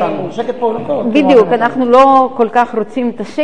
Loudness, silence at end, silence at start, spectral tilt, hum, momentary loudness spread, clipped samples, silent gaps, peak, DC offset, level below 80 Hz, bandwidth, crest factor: -12 LUFS; 0 s; 0 s; -6.5 dB/octave; none; 11 LU; 0.2%; none; 0 dBFS; 2%; -50 dBFS; 9.8 kHz; 12 dB